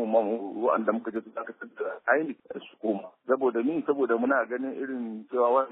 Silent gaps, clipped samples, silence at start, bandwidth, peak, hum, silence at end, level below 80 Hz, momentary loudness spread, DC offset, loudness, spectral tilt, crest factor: none; under 0.1%; 0 s; 4 kHz; -8 dBFS; none; 0 s; -80 dBFS; 11 LU; under 0.1%; -28 LUFS; -4.5 dB/octave; 20 dB